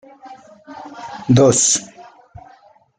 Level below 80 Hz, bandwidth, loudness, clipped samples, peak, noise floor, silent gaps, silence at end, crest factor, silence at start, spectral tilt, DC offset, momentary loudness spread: -56 dBFS; 9.6 kHz; -14 LUFS; under 0.1%; -2 dBFS; -50 dBFS; none; 0.95 s; 18 dB; 0.25 s; -4.5 dB/octave; under 0.1%; 24 LU